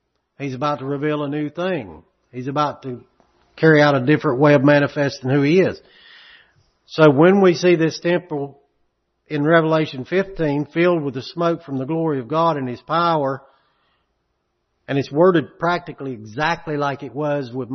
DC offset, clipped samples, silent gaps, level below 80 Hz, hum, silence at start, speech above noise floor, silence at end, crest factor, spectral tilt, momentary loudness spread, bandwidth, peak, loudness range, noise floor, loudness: under 0.1%; under 0.1%; none; -56 dBFS; none; 0.4 s; 53 dB; 0 s; 18 dB; -7 dB/octave; 16 LU; 6.4 kHz; 0 dBFS; 6 LU; -71 dBFS; -19 LUFS